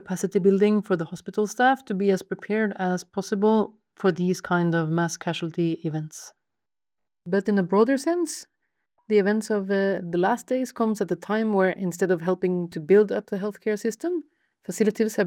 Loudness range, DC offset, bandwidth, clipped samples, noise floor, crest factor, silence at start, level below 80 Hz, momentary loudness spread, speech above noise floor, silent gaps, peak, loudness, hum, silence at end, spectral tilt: 3 LU; under 0.1%; 16.5 kHz; under 0.1%; -90 dBFS; 16 dB; 0.05 s; -72 dBFS; 9 LU; 66 dB; none; -8 dBFS; -24 LUFS; none; 0 s; -6 dB/octave